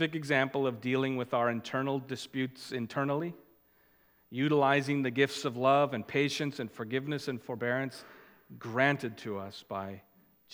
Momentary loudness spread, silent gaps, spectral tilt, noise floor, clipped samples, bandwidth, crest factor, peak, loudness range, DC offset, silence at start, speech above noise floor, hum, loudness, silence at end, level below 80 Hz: 13 LU; none; -5.5 dB/octave; -67 dBFS; under 0.1%; 16.5 kHz; 22 dB; -12 dBFS; 5 LU; under 0.1%; 0 s; 35 dB; none; -32 LUFS; 0.55 s; -78 dBFS